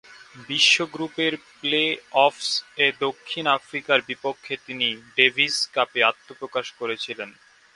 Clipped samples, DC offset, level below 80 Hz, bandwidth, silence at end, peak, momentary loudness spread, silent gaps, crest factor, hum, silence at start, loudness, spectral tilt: under 0.1%; under 0.1%; -72 dBFS; 11.5 kHz; 0.45 s; 0 dBFS; 12 LU; none; 24 dB; none; 0.1 s; -22 LUFS; -2 dB/octave